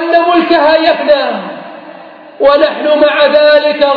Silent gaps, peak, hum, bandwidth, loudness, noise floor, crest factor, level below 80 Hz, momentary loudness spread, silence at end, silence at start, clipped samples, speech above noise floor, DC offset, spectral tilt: none; 0 dBFS; none; 5.4 kHz; -9 LUFS; -32 dBFS; 10 dB; -50 dBFS; 13 LU; 0 s; 0 s; under 0.1%; 24 dB; under 0.1%; -6 dB/octave